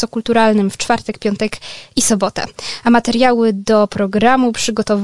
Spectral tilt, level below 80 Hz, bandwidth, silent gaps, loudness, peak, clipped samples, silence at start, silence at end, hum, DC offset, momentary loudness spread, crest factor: -4 dB/octave; -44 dBFS; 11.5 kHz; none; -15 LUFS; 0 dBFS; under 0.1%; 0 s; 0 s; none; 2%; 9 LU; 14 dB